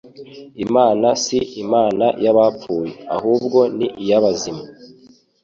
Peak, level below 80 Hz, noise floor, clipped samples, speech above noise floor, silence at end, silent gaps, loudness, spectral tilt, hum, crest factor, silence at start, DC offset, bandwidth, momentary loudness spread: -2 dBFS; -56 dBFS; -49 dBFS; under 0.1%; 32 dB; 0.55 s; none; -17 LUFS; -5 dB/octave; none; 16 dB; 0.05 s; under 0.1%; 7.8 kHz; 12 LU